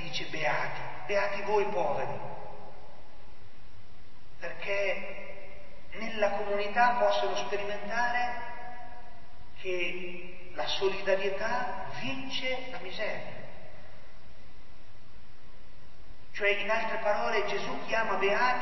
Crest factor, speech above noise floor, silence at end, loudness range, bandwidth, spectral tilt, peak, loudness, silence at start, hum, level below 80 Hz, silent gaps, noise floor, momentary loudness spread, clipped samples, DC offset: 22 dB; 23 dB; 0 s; 9 LU; 6.2 kHz; -4 dB/octave; -10 dBFS; -31 LUFS; 0 s; none; -58 dBFS; none; -55 dBFS; 19 LU; under 0.1%; 3%